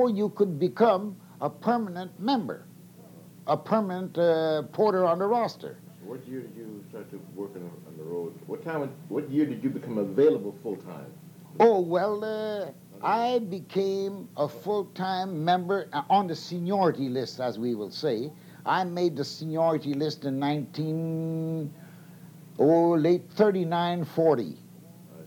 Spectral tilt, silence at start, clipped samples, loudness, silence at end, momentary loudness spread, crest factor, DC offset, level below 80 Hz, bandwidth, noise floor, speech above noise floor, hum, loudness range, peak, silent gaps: -7 dB/octave; 0 s; under 0.1%; -27 LUFS; 0 s; 16 LU; 20 dB; under 0.1%; -82 dBFS; 19 kHz; -49 dBFS; 22 dB; 60 Hz at -55 dBFS; 6 LU; -8 dBFS; none